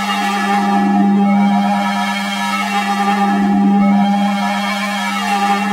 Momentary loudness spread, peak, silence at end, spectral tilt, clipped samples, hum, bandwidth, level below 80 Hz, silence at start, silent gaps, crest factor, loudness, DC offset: 5 LU; -2 dBFS; 0 s; -5.5 dB/octave; under 0.1%; none; 15.5 kHz; -56 dBFS; 0 s; none; 12 dB; -15 LUFS; under 0.1%